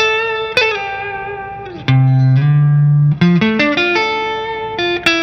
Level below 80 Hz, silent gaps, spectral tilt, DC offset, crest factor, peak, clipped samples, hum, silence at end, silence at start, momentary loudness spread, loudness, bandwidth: -46 dBFS; none; -6.5 dB/octave; under 0.1%; 14 dB; 0 dBFS; under 0.1%; none; 0 s; 0 s; 11 LU; -14 LUFS; 7.6 kHz